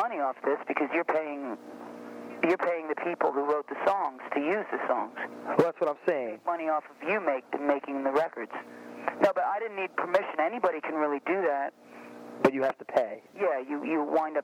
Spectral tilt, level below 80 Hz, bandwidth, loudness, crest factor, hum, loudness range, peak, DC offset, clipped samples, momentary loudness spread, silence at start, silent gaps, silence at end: -6.5 dB/octave; -80 dBFS; 15 kHz; -30 LUFS; 22 dB; none; 1 LU; -8 dBFS; under 0.1%; under 0.1%; 12 LU; 0 s; none; 0 s